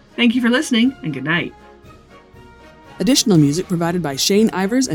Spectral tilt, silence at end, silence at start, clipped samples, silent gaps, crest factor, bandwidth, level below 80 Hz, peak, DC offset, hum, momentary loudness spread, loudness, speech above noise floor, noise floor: -4.5 dB/octave; 0 s; 0.2 s; under 0.1%; none; 16 dB; 20 kHz; -50 dBFS; -2 dBFS; under 0.1%; none; 7 LU; -17 LUFS; 27 dB; -44 dBFS